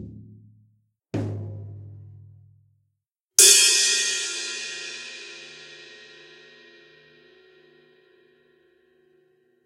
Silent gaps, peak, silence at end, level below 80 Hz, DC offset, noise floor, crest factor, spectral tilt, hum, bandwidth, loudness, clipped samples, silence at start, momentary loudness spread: 3.20-3.29 s; 0 dBFS; 3.8 s; -66 dBFS; under 0.1%; -79 dBFS; 28 dB; 0 dB/octave; none; 16 kHz; -18 LUFS; under 0.1%; 0 s; 30 LU